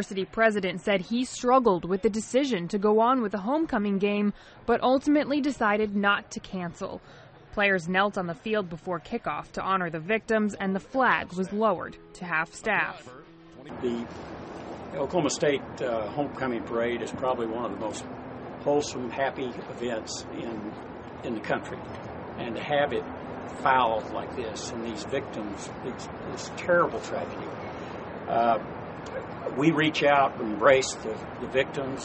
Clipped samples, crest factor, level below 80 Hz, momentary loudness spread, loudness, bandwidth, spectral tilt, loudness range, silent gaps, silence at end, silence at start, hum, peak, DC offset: under 0.1%; 22 dB; -56 dBFS; 14 LU; -28 LUFS; 8.4 kHz; -5 dB/octave; 7 LU; none; 0 s; 0 s; none; -6 dBFS; under 0.1%